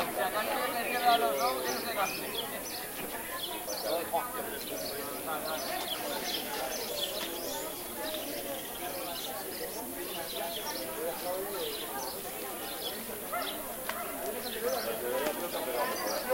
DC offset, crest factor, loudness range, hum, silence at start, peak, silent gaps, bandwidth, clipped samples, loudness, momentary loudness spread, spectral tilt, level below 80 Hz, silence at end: under 0.1%; 20 dB; 4 LU; none; 0 s; -14 dBFS; none; 16 kHz; under 0.1%; -34 LUFS; 6 LU; -1.5 dB/octave; -62 dBFS; 0 s